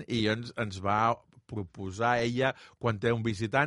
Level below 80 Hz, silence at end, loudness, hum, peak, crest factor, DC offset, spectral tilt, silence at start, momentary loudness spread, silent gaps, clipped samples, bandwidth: -58 dBFS; 0 s; -30 LUFS; none; -10 dBFS; 20 dB; under 0.1%; -6 dB/octave; 0 s; 12 LU; none; under 0.1%; 11.5 kHz